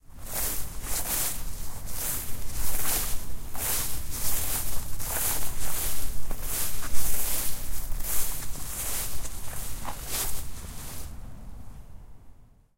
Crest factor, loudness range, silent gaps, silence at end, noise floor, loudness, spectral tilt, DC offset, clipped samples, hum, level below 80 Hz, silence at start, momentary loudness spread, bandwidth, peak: 16 dB; 5 LU; none; 0.5 s; -49 dBFS; -31 LUFS; -2 dB/octave; under 0.1%; under 0.1%; none; -36 dBFS; 0.1 s; 13 LU; 16 kHz; -8 dBFS